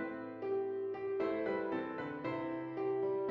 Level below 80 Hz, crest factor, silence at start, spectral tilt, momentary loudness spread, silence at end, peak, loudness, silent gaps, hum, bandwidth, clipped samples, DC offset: -76 dBFS; 12 dB; 0 s; -5.5 dB/octave; 5 LU; 0 s; -26 dBFS; -38 LUFS; none; none; 5.2 kHz; under 0.1%; under 0.1%